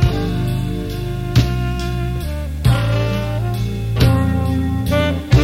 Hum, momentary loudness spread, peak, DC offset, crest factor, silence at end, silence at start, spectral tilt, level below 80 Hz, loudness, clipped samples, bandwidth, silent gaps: none; 8 LU; -2 dBFS; under 0.1%; 14 dB; 0 s; 0 s; -7 dB/octave; -24 dBFS; -19 LUFS; under 0.1%; 16 kHz; none